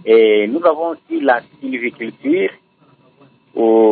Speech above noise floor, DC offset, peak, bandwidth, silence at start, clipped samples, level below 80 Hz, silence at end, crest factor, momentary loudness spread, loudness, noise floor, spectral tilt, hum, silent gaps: 38 dB; under 0.1%; -2 dBFS; 4.4 kHz; 0.05 s; under 0.1%; -72 dBFS; 0 s; 14 dB; 12 LU; -16 LUFS; -52 dBFS; -10 dB/octave; none; none